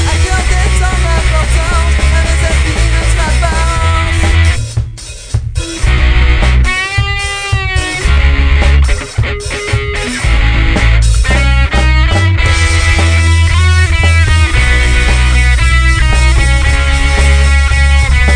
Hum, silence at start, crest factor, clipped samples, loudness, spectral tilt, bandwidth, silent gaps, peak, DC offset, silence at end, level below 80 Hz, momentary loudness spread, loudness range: none; 0 s; 8 dB; 0.2%; -11 LUFS; -4.5 dB/octave; 10.5 kHz; none; 0 dBFS; under 0.1%; 0 s; -10 dBFS; 6 LU; 3 LU